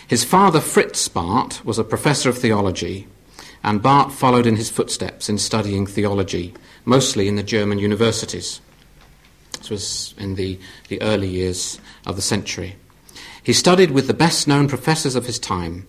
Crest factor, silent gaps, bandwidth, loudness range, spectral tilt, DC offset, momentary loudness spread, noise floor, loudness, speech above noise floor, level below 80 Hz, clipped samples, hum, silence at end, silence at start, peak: 18 dB; none; 16 kHz; 7 LU; -4.5 dB/octave; under 0.1%; 14 LU; -49 dBFS; -19 LUFS; 31 dB; -42 dBFS; under 0.1%; none; 0.05 s; 0 s; -2 dBFS